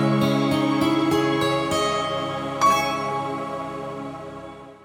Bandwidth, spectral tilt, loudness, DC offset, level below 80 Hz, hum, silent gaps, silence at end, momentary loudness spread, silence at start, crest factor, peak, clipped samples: 19.5 kHz; -5 dB/octave; -22 LUFS; under 0.1%; -54 dBFS; none; none; 0 s; 14 LU; 0 s; 14 dB; -8 dBFS; under 0.1%